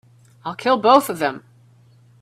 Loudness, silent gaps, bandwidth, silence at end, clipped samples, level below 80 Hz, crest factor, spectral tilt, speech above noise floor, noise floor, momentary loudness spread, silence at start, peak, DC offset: -18 LUFS; none; 16 kHz; 0.8 s; under 0.1%; -66 dBFS; 20 dB; -4 dB/octave; 34 dB; -52 dBFS; 19 LU; 0.45 s; 0 dBFS; under 0.1%